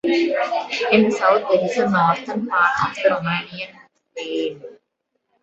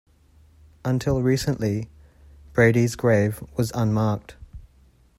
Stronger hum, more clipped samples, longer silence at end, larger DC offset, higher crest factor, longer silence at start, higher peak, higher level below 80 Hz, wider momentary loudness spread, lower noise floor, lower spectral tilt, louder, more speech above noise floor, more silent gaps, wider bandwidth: neither; neither; about the same, 0.7 s vs 0.6 s; neither; about the same, 20 dB vs 18 dB; second, 0.05 s vs 0.85 s; first, 0 dBFS vs -6 dBFS; second, -60 dBFS vs -46 dBFS; first, 16 LU vs 13 LU; first, -74 dBFS vs -56 dBFS; about the same, -5.5 dB/octave vs -6.5 dB/octave; first, -19 LUFS vs -23 LUFS; first, 55 dB vs 35 dB; neither; second, 8.2 kHz vs 14.5 kHz